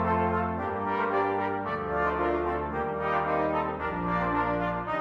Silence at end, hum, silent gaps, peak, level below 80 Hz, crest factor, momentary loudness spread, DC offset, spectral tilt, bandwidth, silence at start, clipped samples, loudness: 0 s; none; none; -14 dBFS; -48 dBFS; 14 dB; 4 LU; under 0.1%; -8.5 dB/octave; 7.4 kHz; 0 s; under 0.1%; -28 LUFS